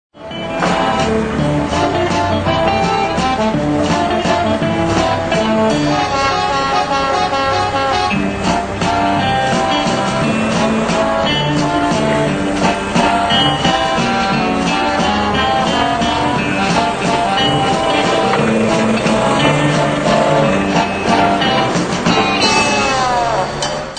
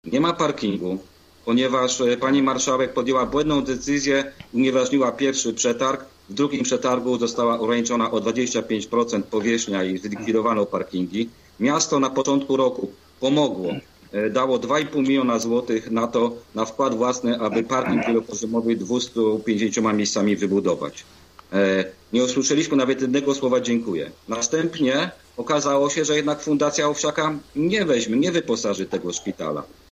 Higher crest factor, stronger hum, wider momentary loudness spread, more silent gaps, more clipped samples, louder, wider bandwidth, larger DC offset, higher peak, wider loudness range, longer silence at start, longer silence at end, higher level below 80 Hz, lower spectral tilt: about the same, 14 dB vs 14 dB; neither; second, 3 LU vs 8 LU; neither; neither; first, -14 LUFS vs -22 LUFS; about the same, 9.4 kHz vs 10 kHz; neither; first, 0 dBFS vs -8 dBFS; about the same, 2 LU vs 2 LU; about the same, 0.15 s vs 0.05 s; second, 0 s vs 0.25 s; first, -36 dBFS vs -56 dBFS; about the same, -4.5 dB/octave vs -4 dB/octave